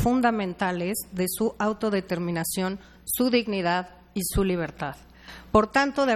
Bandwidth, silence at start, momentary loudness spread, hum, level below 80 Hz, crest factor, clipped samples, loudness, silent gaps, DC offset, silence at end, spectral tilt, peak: 16.5 kHz; 0 s; 13 LU; none; -44 dBFS; 22 dB; under 0.1%; -26 LUFS; none; under 0.1%; 0 s; -4.5 dB/octave; -4 dBFS